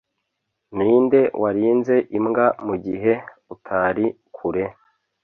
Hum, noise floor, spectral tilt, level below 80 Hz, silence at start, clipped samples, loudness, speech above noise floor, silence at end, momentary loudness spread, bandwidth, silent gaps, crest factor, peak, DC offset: none; -77 dBFS; -9.5 dB/octave; -56 dBFS; 0.7 s; under 0.1%; -20 LUFS; 57 dB; 0.5 s; 9 LU; 6.2 kHz; none; 16 dB; -4 dBFS; under 0.1%